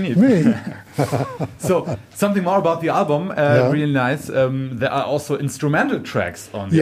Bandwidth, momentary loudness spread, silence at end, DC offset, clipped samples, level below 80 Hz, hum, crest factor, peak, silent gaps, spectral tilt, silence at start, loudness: 15.5 kHz; 9 LU; 0 s; under 0.1%; under 0.1%; -56 dBFS; none; 16 dB; -4 dBFS; none; -6.5 dB/octave; 0 s; -19 LUFS